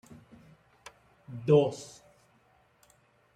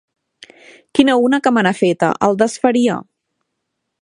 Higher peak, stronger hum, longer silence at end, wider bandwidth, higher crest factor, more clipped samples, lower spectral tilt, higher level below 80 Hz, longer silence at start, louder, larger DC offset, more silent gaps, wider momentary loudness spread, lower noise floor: second, -12 dBFS vs 0 dBFS; neither; first, 1.5 s vs 1 s; about the same, 11 kHz vs 11 kHz; first, 22 dB vs 16 dB; neither; first, -7 dB/octave vs -5 dB/octave; second, -72 dBFS vs -58 dBFS; first, 1.3 s vs 0.95 s; second, -27 LUFS vs -15 LUFS; neither; neither; first, 29 LU vs 5 LU; second, -66 dBFS vs -75 dBFS